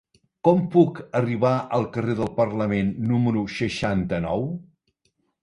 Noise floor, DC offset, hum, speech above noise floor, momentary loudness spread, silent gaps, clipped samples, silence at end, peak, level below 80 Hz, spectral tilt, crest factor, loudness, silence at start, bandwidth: -71 dBFS; under 0.1%; none; 49 dB; 7 LU; none; under 0.1%; 0.8 s; -4 dBFS; -50 dBFS; -8 dB/octave; 20 dB; -23 LUFS; 0.45 s; 11 kHz